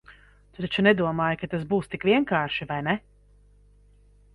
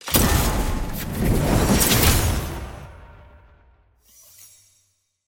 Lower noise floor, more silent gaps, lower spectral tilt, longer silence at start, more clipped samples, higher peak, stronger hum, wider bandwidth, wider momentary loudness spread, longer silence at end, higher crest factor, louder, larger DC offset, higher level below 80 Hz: second, -56 dBFS vs -67 dBFS; neither; first, -7.5 dB/octave vs -4 dB/octave; about the same, 0.1 s vs 0.05 s; neither; second, -6 dBFS vs -2 dBFS; first, 50 Hz at -45 dBFS vs none; second, 11 kHz vs 17 kHz; second, 9 LU vs 17 LU; second, 1.35 s vs 2.15 s; about the same, 20 dB vs 20 dB; second, -25 LUFS vs -20 LUFS; neither; second, -56 dBFS vs -28 dBFS